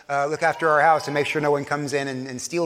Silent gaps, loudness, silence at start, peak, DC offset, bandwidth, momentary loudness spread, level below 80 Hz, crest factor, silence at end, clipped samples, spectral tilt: none; -22 LUFS; 0.1 s; -6 dBFS; under 0.1%; 15.5 kHz; 10 LU; -66 dBFS; 16 dB; 0 s; under 0.1%; -4.5 dB/octave